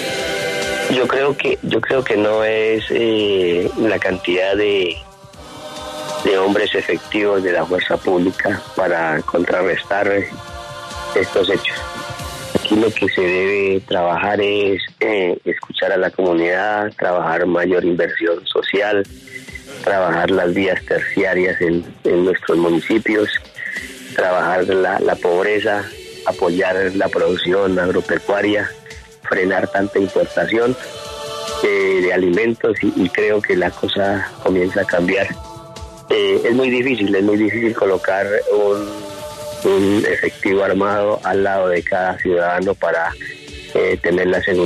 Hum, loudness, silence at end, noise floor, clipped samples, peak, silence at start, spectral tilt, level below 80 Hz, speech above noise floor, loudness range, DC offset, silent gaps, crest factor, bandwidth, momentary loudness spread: none; -17 LUFS; 0 s; -38 dBFS; under 0.1%; -2 dBFS; 0 s; -5 dB/octave; -48 dBFS; 21 dB; 2 LU; under 0.1%; none; 16 dB; 13.5 kHz; 10 LU